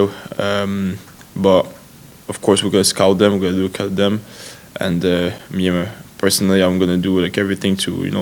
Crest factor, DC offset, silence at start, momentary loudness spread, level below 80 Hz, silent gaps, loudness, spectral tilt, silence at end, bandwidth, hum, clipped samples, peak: 18 dB; under 0.1%; 0 s; 14 LU; -50 dBFS; none; -17 LUFS; -5 dB/octave; 0 s; 19 kHz; none; under 0.1%; 0 dBFS